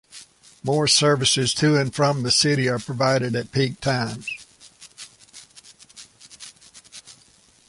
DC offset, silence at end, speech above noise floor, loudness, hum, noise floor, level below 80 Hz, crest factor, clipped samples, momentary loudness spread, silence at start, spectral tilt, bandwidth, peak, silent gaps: under 0.1%; 0.55 s; 35 dB; -20 LUFS; none; -56 dBFS; -56 dBFS; 20 dB; under 0.1%; 24 LU; 0.15 s; -4 dB/octave; 11.5 kHz; -4 dBFS; none